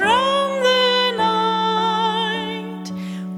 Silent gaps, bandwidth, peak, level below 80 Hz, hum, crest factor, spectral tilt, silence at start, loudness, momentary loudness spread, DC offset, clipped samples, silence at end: none; 15.5 kHz; -6 dBFS; -60 dBFS; none; 14 dB; -4 dB/octave; 0 s; -18 LUFS; 13 LU; under 0.1%; under 0.1%; 0 s